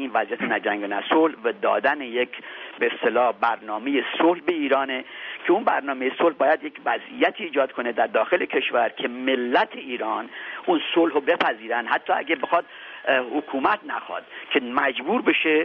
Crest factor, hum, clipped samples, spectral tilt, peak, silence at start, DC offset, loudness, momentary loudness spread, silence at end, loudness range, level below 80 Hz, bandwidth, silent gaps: 18 dB; none; under 0.1%; -0.5 dB/octave; -6 dBFS; 0 s; under 0.1%; -23 LUFS; 8 LU; 0 s; 1 LU; -72 dBFS; 5.8 kHz; none